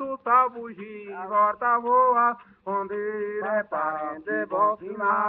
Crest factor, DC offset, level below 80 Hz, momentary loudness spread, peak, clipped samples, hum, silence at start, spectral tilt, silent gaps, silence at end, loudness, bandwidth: 16 dB; under 0.1%; -70 dBFS; 16 LU; -8 dBFS; under 0.1%; none; 0 s; -4.5 dB/octave; none; 0 s; -24 LUFS; 3.9 kHz